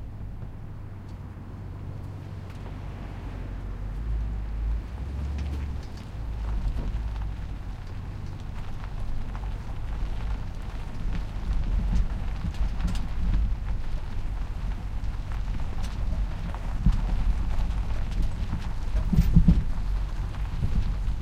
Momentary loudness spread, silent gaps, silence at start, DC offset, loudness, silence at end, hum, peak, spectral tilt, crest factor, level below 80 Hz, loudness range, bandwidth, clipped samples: 10 LU; none; 0 s; under 0.1%; -32 LUFS; 0 s; none; -4 dBFS; -7.5 dB/octave; 22 dB; -28 dBFS; 9 LU; 8.6 kHz; under 0.1%